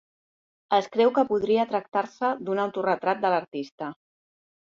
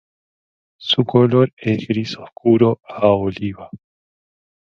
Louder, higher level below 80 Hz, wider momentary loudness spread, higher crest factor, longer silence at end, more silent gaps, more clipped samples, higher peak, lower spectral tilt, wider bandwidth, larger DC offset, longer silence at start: second, -25 LUFS vs -17 LUFS; second, -70 dBFS vs -52 dBFS; about the same, 13 LU vs 13 LU; about the same, 18 dB vs 18 dB; second, 0.75 s vs 1 s; about the same, 3.72-3.78 s vs 1.53-1.57 s; neither; second, -8 dBFS vs 0 dBFS; second, -6 dB/octave vs -7.5 dB/octave; about the same, 7.4 kHz vs 7 kHz; neither; about the same, 0.7 s vs 0.8 s